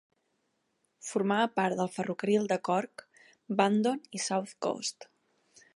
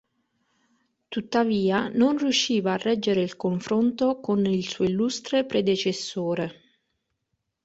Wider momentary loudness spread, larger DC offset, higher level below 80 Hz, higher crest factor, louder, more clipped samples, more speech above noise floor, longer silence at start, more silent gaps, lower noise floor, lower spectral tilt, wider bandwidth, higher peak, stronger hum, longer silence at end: first, 9 LU vs 6 LU; neither; second, -80 dBFS vs -64 dBFS; first, 22 dB vs 16 dB; second, -30 LUFS vs -25 LUFS; neither; second, 47 dB vs 55 dB; about the same, 1.05 s vs 1.1 s; neither; about the same, -77 dBFS vs -78 dBFS; about the same, -4.5 dB/octave vs -5 dB/octave; first, 11.5 kHz vs 8 kHz; about the same, -10 dBFS vs -8 dBFS; neither; second, 0.7 s vs 1.1 s